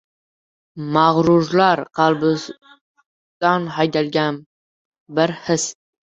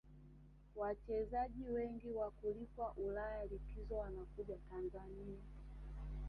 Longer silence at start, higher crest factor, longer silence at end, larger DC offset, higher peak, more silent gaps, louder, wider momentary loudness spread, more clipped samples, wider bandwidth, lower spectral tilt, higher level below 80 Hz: first, 0.75 s vs 0.05 s; about the same, 18 dB vs 16 dB; first, 0.3 s vs 0 s; neither; first, -2 dBFS vs -30 dBFS; first, 2.81-2.95 s, 3.06-3.41 s, 4.46-4.92 s, 5.00-5.06 s vs none; first, -18 LUFS vs -46 LUFS; second, 11 LU vs 14 LU; neither; first, 8.4 kHz vs 5.2 kHz; second, -5 dB/octave vs -9.5 dB/octave; about the same, -58 dBFS vs -54 dBFS